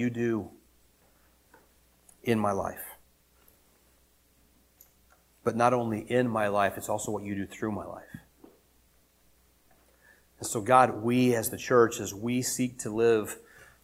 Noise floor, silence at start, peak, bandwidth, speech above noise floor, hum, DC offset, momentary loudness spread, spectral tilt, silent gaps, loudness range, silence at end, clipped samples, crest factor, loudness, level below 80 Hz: -65 dBFS; 0 s; -6 dBFS; 16.5 kHz; 37 dB; none; under 0.1%; 16 LU; -5 dB/octave; none; 12 LU; 0.2 s; under 0.1%; 24 dB; -28 LUFS; -64 dBFS